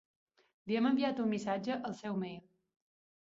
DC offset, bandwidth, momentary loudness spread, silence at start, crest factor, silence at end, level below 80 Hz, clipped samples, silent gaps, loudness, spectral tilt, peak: under 0.1%; 7.8 kHz; 13 LU; 0.65 s; 16 dB; 0.85 s; -78 dBFS; under 0.1%; none; -35 LUFS; -6.5 dB/octave; -22 dBFS